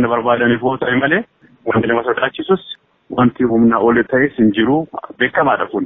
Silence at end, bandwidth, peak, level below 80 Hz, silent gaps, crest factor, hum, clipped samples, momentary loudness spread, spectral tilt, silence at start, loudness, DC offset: 0 s; 3.9 kHz; -2 dBFS; -48 dBFS; none; 14 dB; none; under 0.1%; 9 LU; -4.5 dB/octave; 0 s; -15 LUFS; under 0.1%